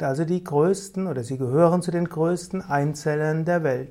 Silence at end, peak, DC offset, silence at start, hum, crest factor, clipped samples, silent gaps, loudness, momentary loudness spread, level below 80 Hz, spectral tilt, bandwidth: 0 s; -6 dBFS; under 0.1%; 0 s; none; 16 dB; under 0.1%; none; -23 LUFS; 8 LU; -60 dBFS; -7 dB/octave; 14.5 kHz